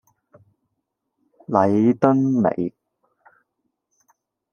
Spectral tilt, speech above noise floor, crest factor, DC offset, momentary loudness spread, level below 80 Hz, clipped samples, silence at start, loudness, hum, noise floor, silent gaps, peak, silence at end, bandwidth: -9.5 dB/octave; 60 dB; 22 dB; under 0.1%; 9 LU; -66 dBFS; under 0.1%; 1.5 s; -19 LUFS; none; -78 dBFS; none; 0 dBFS; 1.85 s; 6.8 kHz